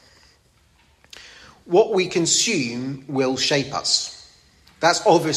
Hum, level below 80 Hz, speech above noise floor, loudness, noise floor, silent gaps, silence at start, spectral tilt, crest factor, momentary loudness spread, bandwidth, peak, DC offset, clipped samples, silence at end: none; -60 dBFS; 38 dB; -20 LUFS; -58 dBFS; none; 1.15 s; -3 dB/octave; 20 dB; 12 LU; 14 kHz; -2 dBFS; under 0.1%; under 0.1%; 0 s